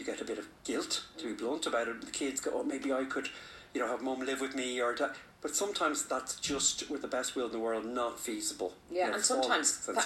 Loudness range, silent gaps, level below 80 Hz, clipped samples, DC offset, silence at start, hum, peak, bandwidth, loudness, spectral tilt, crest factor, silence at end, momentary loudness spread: 3 LU; none; -68 dBFS; under 0.1%; under 0.1%; 0 s; none; -14 dBFS; 16 kHz; -34 LUFS; -1 dB/octave; 22 dB; 0 s; 9 LU